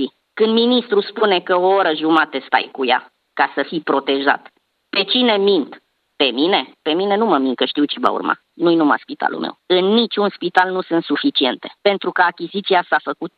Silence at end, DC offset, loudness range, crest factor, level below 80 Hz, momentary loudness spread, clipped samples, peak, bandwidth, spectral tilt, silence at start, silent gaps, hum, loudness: 0.1 s; under 0.1%; 2 LU; 18 dB; -72 dBFS; 7 LU; under 0.1%; 0 dBFS; 5.6 kHz; -6.5 dB/octave; 0 s; none; none; -17 LUFS